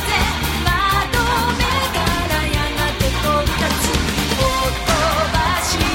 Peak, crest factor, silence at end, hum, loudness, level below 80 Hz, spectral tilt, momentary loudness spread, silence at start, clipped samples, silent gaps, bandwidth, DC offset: -2 dBFS; 16 dB; 0 s; none; -18 LUFS; -26 dBFS; -3.5 dB/octave; 2 LU; 0 s; under 0.1%; none; 16.5 kHz; under 0.1%